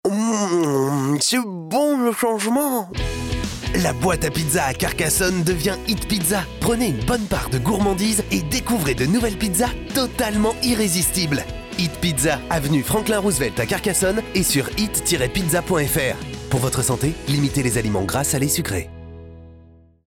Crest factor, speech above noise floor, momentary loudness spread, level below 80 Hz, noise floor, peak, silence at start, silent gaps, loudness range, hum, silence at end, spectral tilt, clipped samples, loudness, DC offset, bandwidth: 12 dB; 28 dB; 6 LU; -36 dBFS; -48 dBFS; -8 dBFS; 0.05 s; none; 1 LU; none; 0.45 s; -4 dB/octave; under 0.1%; -20 LUFS; under 0.1%; 17.5 kHz